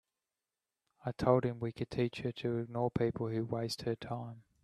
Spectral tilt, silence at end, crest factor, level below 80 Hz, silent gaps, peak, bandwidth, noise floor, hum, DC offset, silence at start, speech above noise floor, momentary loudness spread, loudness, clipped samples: -7 dB/octave; 0.25 s; 24 dB; -64 dBFS; none; -12 dBFS; 13 kHz; under -90 dBFS; none; under 0.1%; 1.05 s; over 55 dB; 12 LU; -36 LUFS; under 0.1%